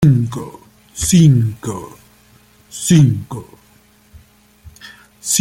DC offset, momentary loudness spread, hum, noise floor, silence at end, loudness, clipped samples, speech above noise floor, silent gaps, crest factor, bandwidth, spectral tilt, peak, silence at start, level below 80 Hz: under 0.1%; 23 LU; none; -51 dBFS; 0 s; -14 LUFS; under 0.1%; 36 dB; none; 16 dB; 16.5 kHz; -5.5 dB/octave; -2 dBFS; 0 s; -42 dBFS